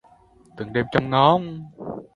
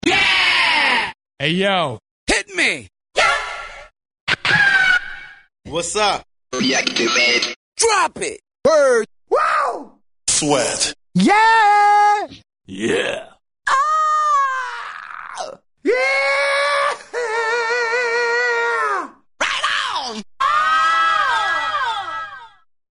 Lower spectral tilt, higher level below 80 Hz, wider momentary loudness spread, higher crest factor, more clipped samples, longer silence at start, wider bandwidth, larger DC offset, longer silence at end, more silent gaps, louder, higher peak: first, -8 dB/octave vs -2 dB/octave; about the same, -54 dBFS vs -50 dBFS; first, 18 LU vs 15 LU; first, 22 dB vs 16 dB; neither; first, 0.55 s vs 0.05 s; about the same, 10.5 kHz vs 11 kHz; neither; second, 0.1 s vs 0.45 s; second, none vs 2.11-2.27 s, 4.20-4.27 s, 7.56-7.72 s; second, -20 LUFS vs -17 LUFS; about the same, 0 dBFS vs -2 dBFS